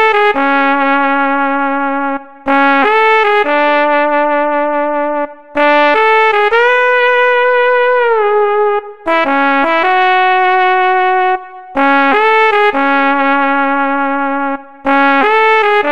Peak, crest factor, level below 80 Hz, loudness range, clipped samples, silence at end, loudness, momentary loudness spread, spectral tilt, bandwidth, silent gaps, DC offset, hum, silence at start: -2 dBFS; 10 dB; -54 dBFS; 1 LU; under 0.1%; 0 s; -11 LUFS; 7 LU; -4 dB/octave; 8 kHz; none; 3%; none; 0 s